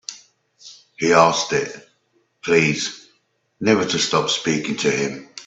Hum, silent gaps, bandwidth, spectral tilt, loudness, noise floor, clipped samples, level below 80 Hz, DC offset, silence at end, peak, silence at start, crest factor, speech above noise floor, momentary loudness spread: none; none; 8.4 kHz; -3.5 dB/octave; -19 LUFS; -65 dBFS; under 0.1%; -62 dBFS; under 0.1%; 0.05 s; 0 dBFS; 0.1 s; 20 dB; 46 dB; 14 LU